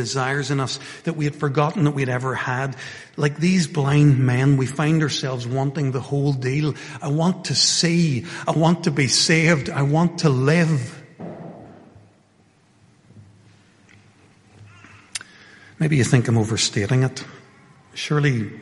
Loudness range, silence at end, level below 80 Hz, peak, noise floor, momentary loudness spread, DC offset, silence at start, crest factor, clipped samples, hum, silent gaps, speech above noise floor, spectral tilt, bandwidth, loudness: 8 LU; 0 s; -56 dBFS; -2 dBFS; -57 dBFS; 17 LU; under 0.1%; 0 s; 18 dB; under 0.1%; none; none; 37 dB; -5 dB/octave; 11.5 kHz; -20 LUFS